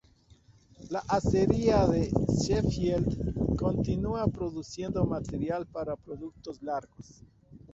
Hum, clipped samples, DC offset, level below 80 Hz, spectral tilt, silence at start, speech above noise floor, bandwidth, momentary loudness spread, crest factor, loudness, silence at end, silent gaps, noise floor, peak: none; under 0.1%; under 0.1%; -42 dBFS; -7 dB/octave; 0.8 s; 31 dB; 8 kHz; 12 LU; 22 dB; -29 LUFS; 0.15 s; none; -60 dBFS; -8 dBFS